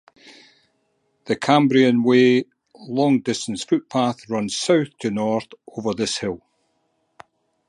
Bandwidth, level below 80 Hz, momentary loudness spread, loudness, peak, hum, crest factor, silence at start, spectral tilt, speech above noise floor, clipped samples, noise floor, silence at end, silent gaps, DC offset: 11 kHz; -62 dBFS; 13 LU; -20 LUFS; -2 dBFS; none; 20 dB; 0.25 s; -5 dB/octave; 49 dB; under 0.1%; -69 dBFS; 1.3 s; none; under 0.1%